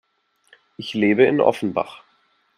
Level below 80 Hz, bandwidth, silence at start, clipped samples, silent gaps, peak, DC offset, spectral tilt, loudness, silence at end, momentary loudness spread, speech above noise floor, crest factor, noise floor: -66 dBFS; 11 kHz; 0.8 s; under 0.1%; none; 0 dBFS; under 0.1%; -6.5 dB/octave; -19 LUFS; 0.6 s; 15 LU; 44 dB; 22 dB; -63 dBFS